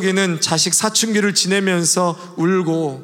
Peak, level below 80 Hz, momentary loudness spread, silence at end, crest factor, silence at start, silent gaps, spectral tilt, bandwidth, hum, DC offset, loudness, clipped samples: -2 dBFS; -68 dBFS; 5 LU; 0 s; 16 dB; 0 s; none; -3 dB/octave; 17 kHz; none; under 0.1%; -16 LUFS; under 0.1%